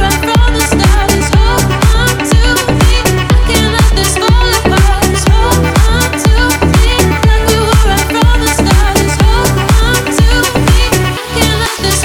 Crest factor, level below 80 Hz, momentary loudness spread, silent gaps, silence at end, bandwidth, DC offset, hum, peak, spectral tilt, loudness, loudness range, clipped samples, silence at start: 8 dB; -12 dBFS; 2 LU; none; 0 s; 18 kHz; under 0.1%; none; 0 dBFS; -4.5 dB/octave; -10 LUFS; 0 LU; under 0.1%; 0 s